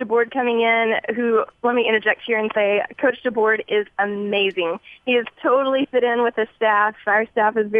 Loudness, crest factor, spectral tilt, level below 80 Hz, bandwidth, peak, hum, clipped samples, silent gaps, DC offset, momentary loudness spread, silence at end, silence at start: -20 LUFS; 14 dB; -6.5 dB/octave; -68 dBFS; 3.8 kHz; -6 dBFS; none; under 0.1%; none; under 0.1%; 4 LU; 0 s; 0 s